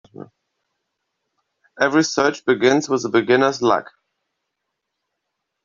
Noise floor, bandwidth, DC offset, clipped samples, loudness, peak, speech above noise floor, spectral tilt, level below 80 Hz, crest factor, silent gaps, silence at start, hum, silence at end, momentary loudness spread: -78 dBFS; 7.6 kHz; under 0.1%; under 0.1%; -18 LUFS; -2 dBFS; 61 dB; -4 dB/octave; -64 dBFS; 20 dB; none; 0.2 s; none; 1.75 s; 3 LU